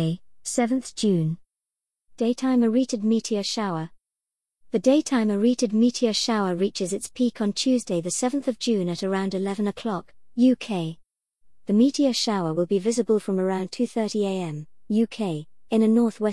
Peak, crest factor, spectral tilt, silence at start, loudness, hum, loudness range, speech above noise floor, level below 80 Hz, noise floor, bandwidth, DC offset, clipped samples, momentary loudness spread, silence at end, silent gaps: -8 dBFS; 16 dB; -5 dB/octave; 0 s; -24 LUFS; none; 2 LU; 65 dB; -66 dBFS; -88 dBFS; 12 kHz; 0.2%; under 0.1%; 9 LU; 0 s; none